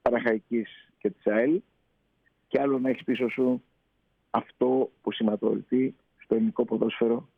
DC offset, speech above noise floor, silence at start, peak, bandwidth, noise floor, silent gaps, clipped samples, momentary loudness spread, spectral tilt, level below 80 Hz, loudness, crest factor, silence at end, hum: under 0.1%; 46 dB; 0.05 s; -10 dBFS; 4.9 kHz; -72 dBFS; none; under 0.1%; 7 LU; -8.5 dB/octave; -68 dBFS; -27 LUFS; 18 dB; 0.15 s; none